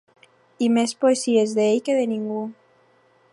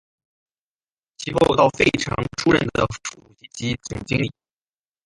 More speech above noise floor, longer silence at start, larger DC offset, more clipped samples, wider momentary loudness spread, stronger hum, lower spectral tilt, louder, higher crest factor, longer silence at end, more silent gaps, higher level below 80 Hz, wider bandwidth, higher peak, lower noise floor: second, 39 dB vs over 69 dB; second, 0.6 s vs 1.2 s; neither; neither; second, 10 LU vs 15 LU; neither; about the same, -4.5 dB/octave vs -5 dB/octave; about the same, -21 LUFS vs -21 LUFS; about the same, 16 dB vs 20 dB; about the same, 0.8 s vs 0.75 s; neither; second, -76 dBFS vs -46 dBFS; about the same, 11.5 kHz vs 11.5 kHz; second, -6 dBFS vs -2 dBFS; second, -59 dBFS vs under -90 dBFS